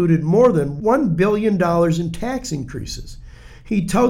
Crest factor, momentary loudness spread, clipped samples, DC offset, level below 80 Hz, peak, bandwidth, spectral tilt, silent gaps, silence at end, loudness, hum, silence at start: 14 dB; 14 LU; under 0.1%; under 0.1%; -38 dBFS; -4 dBFS; 14.5 kHz; -7 dB/octave; none; 0 s; -18 LUFS; none; 0 s